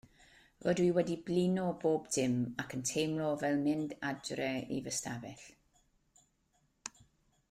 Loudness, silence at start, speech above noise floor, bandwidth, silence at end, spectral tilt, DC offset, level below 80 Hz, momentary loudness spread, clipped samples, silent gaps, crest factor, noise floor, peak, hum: -35 LUFS; 0.6 s; 41 dB; 15.5 kHz; 0.6 s; -5 dB/octave; under 0.1%; -68 dBFS; 16 LU; under 0.1%; none; 16 dB; -76 dBFS; -20 dBFS; none